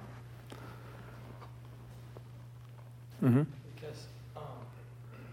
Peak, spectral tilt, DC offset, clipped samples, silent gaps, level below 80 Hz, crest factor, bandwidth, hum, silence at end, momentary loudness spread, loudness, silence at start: -16 dBFS; -8.5 dB/octave; under 0.1%; under 0.1%; none; -64 dBFS; 22 dB; 15.5 kHz; none; 0 s; 21 LU; -37 LUFS; 0 s